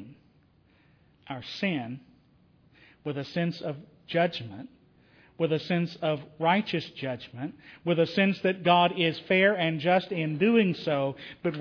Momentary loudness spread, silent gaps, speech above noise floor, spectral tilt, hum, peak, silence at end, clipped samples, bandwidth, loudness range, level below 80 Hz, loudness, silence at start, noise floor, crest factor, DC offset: 16 LU; none; 35 dB; -7.5 dB/octave; none; -8 dBFS; 0 s; under 0.1%; 5.4 kHz; 11 LU; -70 dBFS; -27 LUFS; 0 s; -63 dBFS; 20 dB; under 0.1%